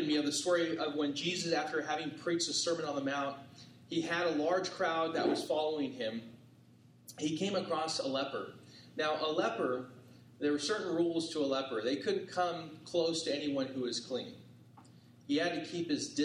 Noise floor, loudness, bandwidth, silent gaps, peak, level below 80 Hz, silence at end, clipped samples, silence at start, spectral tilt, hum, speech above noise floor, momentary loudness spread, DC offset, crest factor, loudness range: -61 dBFS; -35 LUFS; 14.5 kHz; none; -18 dBFS; -80 dBFS; 0 s; under 0.1%; 0 s; -3.5 dB/octave; none; 27 dB; 10 LU; under 0.1%; 18 dB; 3 LU